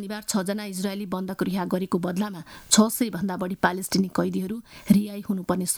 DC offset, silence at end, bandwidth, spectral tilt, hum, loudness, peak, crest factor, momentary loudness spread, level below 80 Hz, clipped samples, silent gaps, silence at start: under 0.1%; 0 s; over 20 kHz; -4.5 dB/octave; none; -25 LUFS; -2 dBFS; 24 dB; 10 LU; -58 dBFS; under 0.1%; none; 0 s